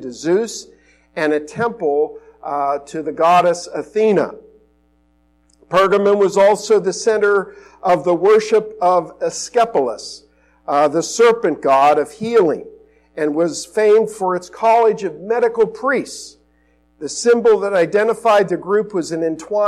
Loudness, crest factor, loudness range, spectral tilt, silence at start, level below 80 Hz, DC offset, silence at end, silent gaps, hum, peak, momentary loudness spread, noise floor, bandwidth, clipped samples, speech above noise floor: -16 LUFS; 12 dB; 3 LU; -4.5 dB/octave; 0 s; -58 dBFS; under 0.1%; 0 s; none; none; -4 dBFS; 12 LU; -58 dBFS; 12.5 kHz; under 0.1%; 42 dB